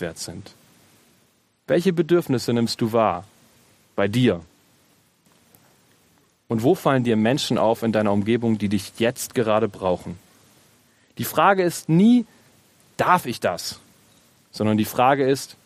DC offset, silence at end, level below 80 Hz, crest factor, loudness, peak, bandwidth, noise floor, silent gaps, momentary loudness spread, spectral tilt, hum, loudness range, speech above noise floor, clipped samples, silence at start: under 0.1%; 0.15 s; -62 dBFS; 20 dB; -21 LUFS; -2 dBFS; 15 kHz; -63 dBFS; none; 14 LU; -5.5 dB/octave; none; 4 LU; 42 dB; under 0.1%; 0 s